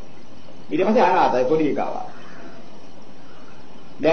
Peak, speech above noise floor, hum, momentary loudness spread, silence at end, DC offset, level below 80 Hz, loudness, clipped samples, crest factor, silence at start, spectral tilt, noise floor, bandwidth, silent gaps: -6 dBFS; 26 dB; none; 24 LU; 0 s; 5%; -60 dBFS; -20 LUFS; under 0.1%; 18 dB; 0.6 s; -6.5 dB/octave; -45 dBFS; 6.6 kHz; none